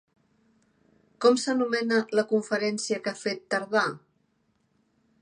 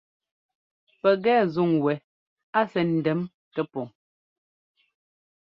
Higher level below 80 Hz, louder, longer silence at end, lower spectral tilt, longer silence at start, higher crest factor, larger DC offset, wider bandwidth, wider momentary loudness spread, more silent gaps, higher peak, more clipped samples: second, -80 dBFS vs -70 dBFS; about the same, -26 LUFS vs -25 LUFS; second, 1.25 s vs 1.55 s; second, -3.5 dB/octave vs -9 dB/octave; first, 1.2 s vs 1.05 s; about the same, 22 dB vs 20 dB; neither; first, 10 kHz vs 5.8 kHz; second, 8 LU vs 12 LU; second, none vs 2.04-2.37 s, 2.43-2.53 s, 3.34-3.51 s; about the same, -8 dBFS vs -8 dBFS; neither